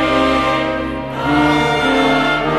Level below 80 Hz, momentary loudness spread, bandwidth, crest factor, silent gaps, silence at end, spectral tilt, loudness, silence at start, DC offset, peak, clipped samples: -34 dBFS; 7 LU; 13.5 kHz; 14 dB; none; 0 s; -5.5 dB/octave; -15 LUFS; 0 s; under 0.1%; -2 dBFS; under 0.1%